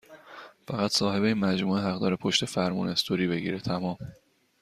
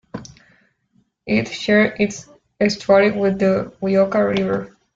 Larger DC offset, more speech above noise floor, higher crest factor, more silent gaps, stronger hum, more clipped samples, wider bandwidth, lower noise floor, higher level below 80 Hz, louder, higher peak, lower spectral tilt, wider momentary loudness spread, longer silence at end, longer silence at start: neither; second, 21 dB vs 45 dB; about the same, 20 dB vs 18 dB; neither; neither; neither; first, 14.5 kHz vs 7.8 kHz; second, -48 dBFS vs -63 dBFS; second, -62 dBFS vs -54 dBFS; second, -27 LUFS vs -18 LUFS; second, -8 dBFS vs -2 dBFS; about the same, -5 dB/octave vs -6 dB/octave; first, 19 LU vs 14 LU; first, 0.45 s vs 0.3 s; about the same, 0.1 s vs 0.15 s